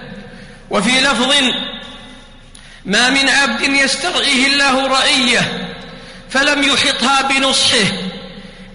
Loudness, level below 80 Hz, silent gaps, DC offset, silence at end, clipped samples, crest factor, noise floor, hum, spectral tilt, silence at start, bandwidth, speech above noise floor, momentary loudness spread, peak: -12 LUFS; -42 dBFS; none; under 0.1%; 0 s; under 0.1%; 14 dB; -38 dBFS; none; -2 dB/octave; 0 s; 11 kHz; 25 dB; 20 LU; -2 dBFS